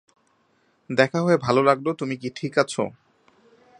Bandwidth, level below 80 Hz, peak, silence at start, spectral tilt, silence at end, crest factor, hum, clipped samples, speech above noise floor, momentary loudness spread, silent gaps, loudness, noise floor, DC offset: 11 kHz; -64 dBFS; -2 dBFS; 0.9 s; -5.5 dB/octave; 0.9 s; 22 dB; none; under 0.1%; 43 dB; 10 LU; none; -22 LUFS; -65 dBFS; under 0.1%